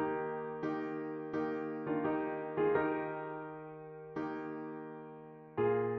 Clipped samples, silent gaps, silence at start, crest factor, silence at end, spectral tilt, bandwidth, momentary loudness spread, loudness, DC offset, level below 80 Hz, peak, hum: under 0.1%; none; 0 s; 18 dB; 0 s; -6.5 dB/octave; 6.2 kHz; 15 LU; -38 LUFS; under 0.1%; -74 dBFS; -20 dBFS; none